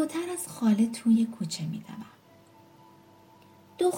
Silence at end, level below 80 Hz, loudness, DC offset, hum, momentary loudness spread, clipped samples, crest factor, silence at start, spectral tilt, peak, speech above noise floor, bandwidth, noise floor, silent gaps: 0 s; -74 dBFS; -28 LUFS; under 0.1%; none; 19 LU; under 0.1%; 16 dB; 0 s; -5.5 dB/octave; -14 dBFS; 29 dB; 17 kHz; -56 dBFS; none